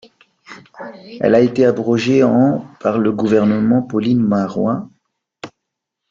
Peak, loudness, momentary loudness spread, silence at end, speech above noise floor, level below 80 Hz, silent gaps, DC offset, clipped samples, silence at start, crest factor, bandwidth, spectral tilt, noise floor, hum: -2 dBFS; -15 LUFS; 21 LU; 0.65 s; 64 dB; -56 dBFS; none; under 0.1%; under 0.1%; 0.5 s; 14 dB; 7.4 kHz; -7.5 dB/octave; -78 dBFS; none